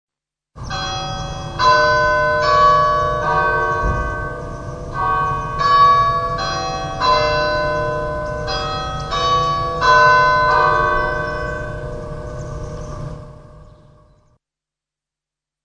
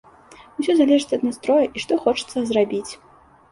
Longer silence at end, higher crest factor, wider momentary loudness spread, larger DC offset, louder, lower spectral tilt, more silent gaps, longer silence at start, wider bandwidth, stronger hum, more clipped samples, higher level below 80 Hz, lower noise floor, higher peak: first, 2 s vs 0.55 s; about the same, 16 dB vs 18 dB; first, 17 LU vs 14 LU; neither; first, -16 LUFS vs -20 LUFS; about the same, -4.5 dB/octave vs -4.5 dB/octave; neither; about the same, 0.55 s vs 0.6 s; second, 10 kHz vs 11.5 kHz; neither; neither; first, -32 dBFS vs -60 dBFS; first, -87 dBFS vs -47 dBFS; about the same, -2 dBFS vs -4 dBFS